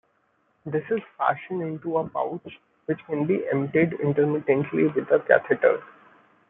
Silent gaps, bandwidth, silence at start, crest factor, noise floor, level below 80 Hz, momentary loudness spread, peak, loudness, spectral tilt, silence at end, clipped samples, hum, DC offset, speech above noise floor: none; 3.9 kHz; 0.65 s; 22 dB; -68 dBFS; -68 dBFS; 11 LU; -2 dBFS; -24 LUFS; -11.5 dB/octave; 0.6 s; under 0.1%; none; under 0.1%; 44 dB